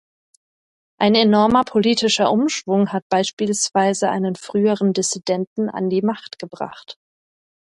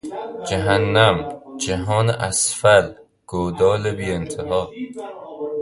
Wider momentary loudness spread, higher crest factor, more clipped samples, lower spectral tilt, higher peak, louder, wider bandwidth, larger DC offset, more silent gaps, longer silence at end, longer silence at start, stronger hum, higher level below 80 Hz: about the same, 15 LU vs 16 LU; about the same, 16 dB vs 20 dB; neither; about the same, -4 dB/octave vs -4 dB/octave; about the same, -2 dBFS vs 0 dBFS; about the same, -18 LUFS vs -19 LUFS; about the same, 11.5 kHz vs 11.5 kHz; neither; first, 3.02-3.10 s, 3.33-3.37 s, 5.47-5.56 s vs none; first, 0.8 s vs 0 s; first, 1 s vs 0.05 s; neither; second, -58 dBFS vs -42 dBFS